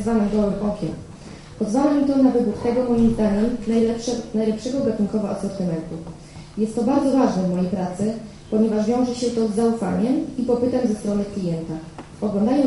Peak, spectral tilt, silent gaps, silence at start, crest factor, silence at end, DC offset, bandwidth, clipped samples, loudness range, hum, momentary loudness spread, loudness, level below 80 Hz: -4 dBFS; -7 dB/octave; none; 0 s; 16 dB; 0 s; under 0.1%; 11.5 kHz; under 0.1%; 3 LU; none; 13 LU; -21 LUFS; -44 dBFS